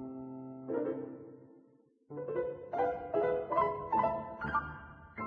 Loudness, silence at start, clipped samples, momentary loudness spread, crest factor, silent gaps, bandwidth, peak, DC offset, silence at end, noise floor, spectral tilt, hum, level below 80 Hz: -35 LUFS; 0 s; under 0.1%; 16 LU; 18 dB; none; 5.4 kHz; -18 dBFS; under 0.1%; 0 s; -66 dBFS; -6 dB/octave; none; -60 dBFS